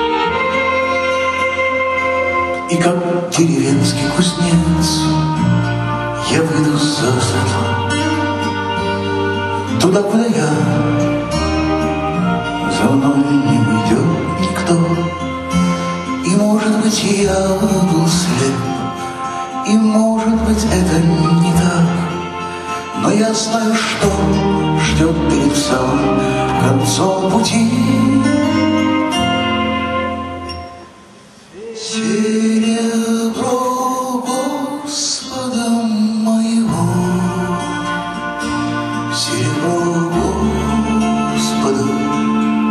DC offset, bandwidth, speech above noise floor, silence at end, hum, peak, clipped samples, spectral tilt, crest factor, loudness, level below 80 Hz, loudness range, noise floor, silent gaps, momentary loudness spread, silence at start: under 0.1%; 13 kHz; 28 dB; 0 s; none; 0 dBFS; under 0.1%; -5 dB/octave; 14 dB; -15 LUFS; -34 dBFS; 3 LU; -41 dBFS; none; 6 LU; 0 s